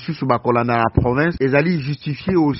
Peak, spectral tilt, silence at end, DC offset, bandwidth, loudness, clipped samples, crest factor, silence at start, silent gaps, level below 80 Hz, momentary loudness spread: 0 dBFS; -6.5 dB/octave; 0 s; under 0.1%; 6 kHz; -18 LUFS; under 0.1%; 18 dB; 0 s; none; -36 dBFS; 6 LU